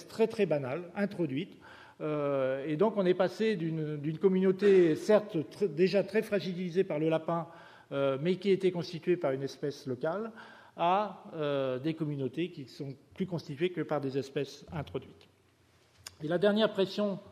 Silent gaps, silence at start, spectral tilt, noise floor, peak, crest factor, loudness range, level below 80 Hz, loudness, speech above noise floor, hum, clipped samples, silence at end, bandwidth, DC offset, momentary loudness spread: none; 0 s; -7 dB/octave; -66 dBFS; -12 dBFS; 18 dB; 8 LU; -74 dBFS; -31 LUFS; 35 dB; none; under 0.1%; 0 s; 13 kHz; under 0.1%; 12 LU